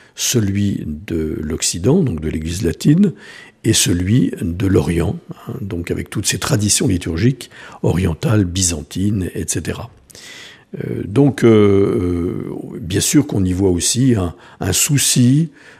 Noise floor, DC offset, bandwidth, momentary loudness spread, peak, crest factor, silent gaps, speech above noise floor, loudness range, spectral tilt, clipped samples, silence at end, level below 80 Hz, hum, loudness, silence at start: -38 dBFS; under 0.1%; 15.5 kHz; 14 LU; 0 dBFS; 16 dB; none; 21 dB; 4 LU; -5 dB/octave; under 0.1%; 0.3 s; -38 dBFS; none; -16 LUFS; 0.15 s